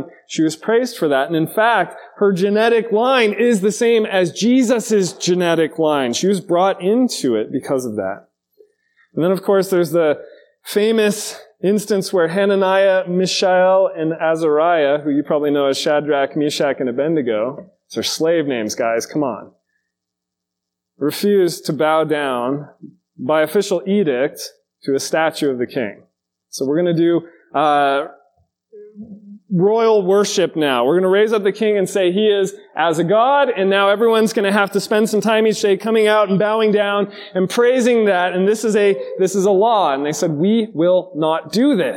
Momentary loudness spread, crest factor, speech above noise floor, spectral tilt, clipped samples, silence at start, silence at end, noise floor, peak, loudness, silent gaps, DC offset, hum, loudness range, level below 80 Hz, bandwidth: 8 LU; 16 dB; 64 dB; -5 dB/octave; under 0.1%; 0 s; 0 s; -81 dBFS; 0 dBFS; -17 LUFS; none; under 0.1%; none; 5 LU; -72 dBFS; 17.5 kHz